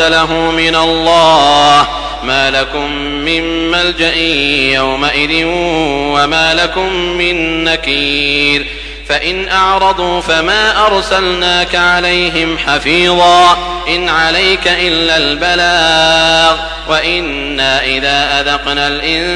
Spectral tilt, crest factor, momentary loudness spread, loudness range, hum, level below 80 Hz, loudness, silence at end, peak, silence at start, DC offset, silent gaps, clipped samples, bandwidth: -3 dB/octave; 12 dB; 7 LU; 2 LU; none; -30 dBFS; -10 LUFS; 0 s; 0 dBFS; 0 s; under 0.1%; none; under 0.1%; 10.5 kHz